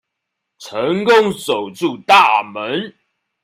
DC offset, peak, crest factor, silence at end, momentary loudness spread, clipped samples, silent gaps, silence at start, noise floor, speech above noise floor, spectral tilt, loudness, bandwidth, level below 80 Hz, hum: under 0.1%; 0 dBFS; 16 dB; 0.55 s; 13 LU; under 0.1%; none; 0.6 s; -77 dBFS; 62 dB; -4 dB/octave; -15 LUFS; 16 kHz; -62 dBFS; none